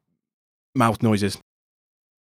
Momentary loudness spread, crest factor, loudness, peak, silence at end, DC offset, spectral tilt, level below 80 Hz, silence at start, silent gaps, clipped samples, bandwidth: 11 LU; 20 dB; -22 LUFS; -4 dBFS; 0.85 s; under 0.1%; -6 dB/octave; -58 dBFS; 0.75 s; none; under 0.1%; 15.5 kHz